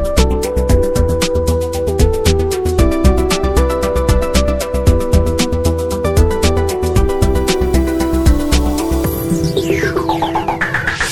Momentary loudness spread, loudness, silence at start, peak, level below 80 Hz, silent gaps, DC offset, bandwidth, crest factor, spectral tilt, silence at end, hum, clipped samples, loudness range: 3 LU; -15 LUFS; 0 s; 0 dBFS; -18 dBFS; none; under 0.1%; 17.5 kHz; 14 dB; -5.5 dB/octave; 0 s; none; under 0.1%; 1 LU